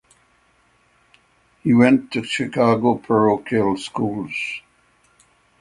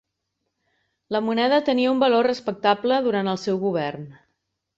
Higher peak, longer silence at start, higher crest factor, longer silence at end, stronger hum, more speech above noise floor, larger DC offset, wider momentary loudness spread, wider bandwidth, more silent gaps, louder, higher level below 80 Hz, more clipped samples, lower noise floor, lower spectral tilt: first, 0 dBFS vs -6 dBFS; first, 1.65 s vs 1.1 s; about the same, 20 dB vs 18 dB; first, 1 s vs 0.65 s; neither; second, 41 dB vs 57 dB; neither; about the same, 11 LU vs 9 LU; first, 11 kHz vs 7.8 kHz; neither; first, -19 LUFS vs -22 LUFS; first, -58 dBFS vs -68 dBFS; neither; second, -60 dBFS vs -78 dBFS; about the same, -6.5 dB/octave vs -6 dB/octave